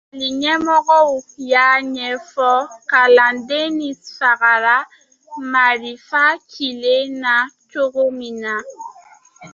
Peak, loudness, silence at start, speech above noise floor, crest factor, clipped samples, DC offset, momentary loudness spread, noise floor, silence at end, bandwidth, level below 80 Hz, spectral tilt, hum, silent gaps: -2 dBFS; -16 LUFS; 0.15 s; 30 dB; 16 dB; under 0.1%; under 0.1%; 13 LU; -46 dBFS; 0.05 s; 7.4 kHz; -66 dBFS; -2 dB/octave; none; none